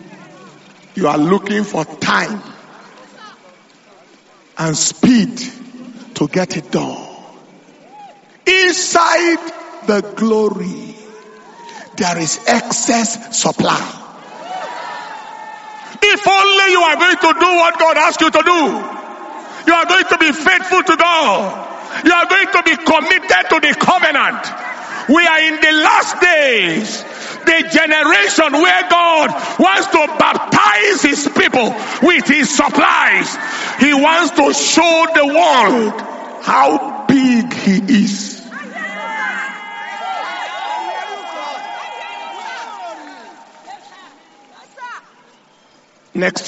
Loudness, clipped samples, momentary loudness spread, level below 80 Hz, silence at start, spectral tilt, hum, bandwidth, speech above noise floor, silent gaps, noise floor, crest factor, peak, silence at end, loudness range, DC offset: -12 LUFS; under 0.1%; 18 LU; -56 dBFS; 0.1 s; -3 dB/octave; none; 8.2 kHz; 37 dB; none; -50 dBFS; 14 dB; 0 dBFS; 0 s; 12 LU; under 0.1%